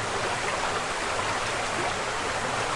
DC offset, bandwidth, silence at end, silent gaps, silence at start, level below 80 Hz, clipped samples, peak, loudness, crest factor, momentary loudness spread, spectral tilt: under 0.1%; 11.5 kHz; 0 s; none; 0 s; -48 dBFS; under 0.1%; -14 dBFS; -27 LUFS; 14 dB; 1 LU; -2.5 dB/octave